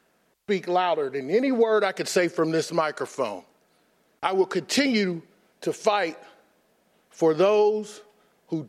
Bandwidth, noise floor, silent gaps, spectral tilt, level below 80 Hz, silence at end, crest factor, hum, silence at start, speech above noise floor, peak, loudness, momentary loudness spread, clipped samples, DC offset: 14.5 kHz; -65 dBFS; none; -4.5 dB/octave; -78 dBFS; 0 s; 18 dB; none; 0.5 s; 41 dB; -8 dBFS; -24 LUFS; 11 LU; under 0.1%; under 0.1%